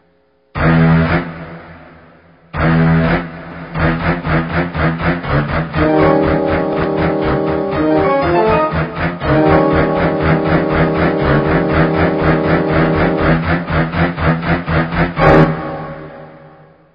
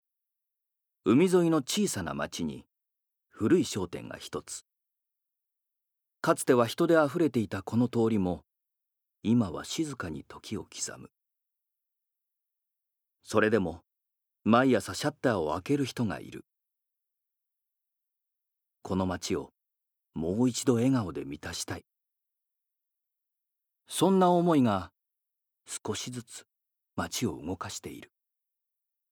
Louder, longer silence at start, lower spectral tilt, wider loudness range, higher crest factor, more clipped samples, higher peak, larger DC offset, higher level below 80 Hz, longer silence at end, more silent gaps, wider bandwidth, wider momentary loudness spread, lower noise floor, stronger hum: first, -14 LUFS vs -29 LUFS; second, 0.55 s vs 1.05 s; first, -10 dB/octave vs -5.5 dB/octave; second, 3 LU vs 10 LU; second, 14 dB vs 24 dB; neither; first, 0 dBFS vs -8 dBFS; neither; first, -28 dBFS vs -66 dBFS; second, 0.45 s vs 1.05 s; neither; second, 5.4 kHz vs 19.5 kHz; second, 8 LU vs 18 LU; second, -55 dBFS vs -84 dBFS; neither